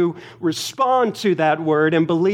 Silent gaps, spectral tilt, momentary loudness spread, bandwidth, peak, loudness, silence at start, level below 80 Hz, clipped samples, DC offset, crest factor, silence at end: none; -5.5 dB/octave; 6 LU; 16 kHz; -4 dBFS; -19 LUFS; 0 s; -68 dBFS; under 0.1%; under 0.1%; 14 dB; 0 s